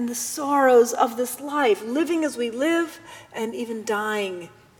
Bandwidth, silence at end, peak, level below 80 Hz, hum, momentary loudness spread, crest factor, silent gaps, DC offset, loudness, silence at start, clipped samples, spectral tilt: 20 kHz; 0.3 s; -6 dBFS; -70 dBFS; none; 14 LU; 18 dB; none; under 0.1%; -23 LUFS; 0 s; under 0.1%; -3 dB/octave